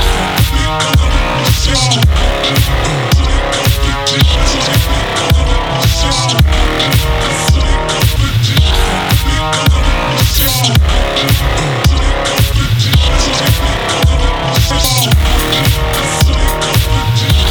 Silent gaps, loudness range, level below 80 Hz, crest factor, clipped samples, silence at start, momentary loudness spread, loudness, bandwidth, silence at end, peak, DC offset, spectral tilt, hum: none; 1 LU; -14 dBFS; 10 dB; under 0.1%; 0 s; 3 LU; -11 LUFS; over 20 kHz; 0 s; 0 dBFS; under 0.1%; -4 dB/octave; none